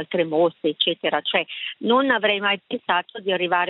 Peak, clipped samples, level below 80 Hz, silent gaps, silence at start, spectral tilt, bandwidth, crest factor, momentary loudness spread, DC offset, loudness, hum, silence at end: -4 dBFS; under 0.1%; -72 dBFS; none; 0 s; -8 dB/octave; 4.6 kHz; 18 dB; 6 LU; under 0.1%; -22 LUFS; none; 0 s